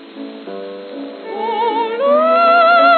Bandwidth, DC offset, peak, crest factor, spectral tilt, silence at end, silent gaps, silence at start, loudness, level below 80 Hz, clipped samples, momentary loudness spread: 4.5 kHz; under 0.1%; -2 dBFS; 14 dB; -7 dB/octave; 0 s; none; 0 s; -13 LUFS; under -90 dBFS; under 0.1%; 20 LU